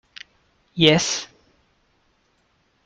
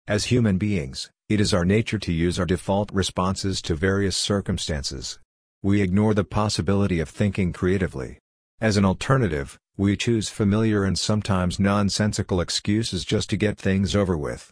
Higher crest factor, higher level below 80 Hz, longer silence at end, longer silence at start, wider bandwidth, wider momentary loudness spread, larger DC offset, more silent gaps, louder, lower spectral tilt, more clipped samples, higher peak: first, 24 dB vs 16 dB; second, -58 dBFS vs -42 dBFS; first, 1.6 s vs 0.05 s; first, 0.75 s vs 0.05 s; about the same, 10 kHz vs 10.5 kHz; first, 26 LU vs 7 LU; neither; second, none vs 5.25-5.61 s, 8.20-8.58 s; first, -18 LUFS vs -23 LUFS; second, -3.5 dB/octave vs -5.5 dB/octave; neither; first, -2 dBFS vs -8 dBFS